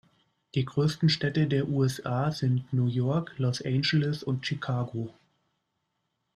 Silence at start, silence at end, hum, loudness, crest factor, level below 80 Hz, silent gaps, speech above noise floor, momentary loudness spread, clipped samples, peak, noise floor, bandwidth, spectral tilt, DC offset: 0.55 s; 1.25 s; none; -28 LUFS; 16 dB; -64 dBFS; none; 52 dB; 6 LU; under 0.1%; -14 dBFS; -79 dBFS; 13 kHz; -6.5 dB/octave; under 0.1%